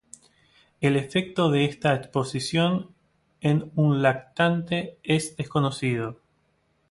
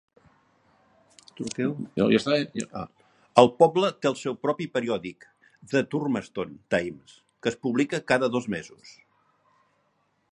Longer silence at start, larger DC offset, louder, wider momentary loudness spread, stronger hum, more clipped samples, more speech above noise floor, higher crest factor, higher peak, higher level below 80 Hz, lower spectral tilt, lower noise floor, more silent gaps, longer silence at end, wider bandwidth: second, 0.8 s vs 1.4 s; neither; about the same, -25 LUFS vs -26 LUFS; second, 7 LU vs 16 LU; neither; neither; about the same, 44 dB vs 45 dB; second, 20 dB vs 26 dB; second, -6 dBFS vs 0 dBFS; about the same, -60 dBFS vs -64 dBFS; about the same, -6 dB/octave vs -5.5 dB/octave; about the same, -68 dBFS vs -70 dBFS; neither; second, 0.75 s vs 1.4 s; about the same, 11.5 kHz vs 10.5 kHz